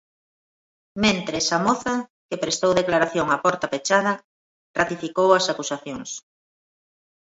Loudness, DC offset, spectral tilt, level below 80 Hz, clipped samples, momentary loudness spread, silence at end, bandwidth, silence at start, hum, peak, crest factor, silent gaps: -22 LUFS; under 0.1%; -3.5 dB/octave; -58 dBFS; under 0.1%; 13 LU; 1.2 s; 8 kHz; 0.95 s; none; -4 dBFS; 20 dB; 2.10-2.29 s, 4.24-4.74 s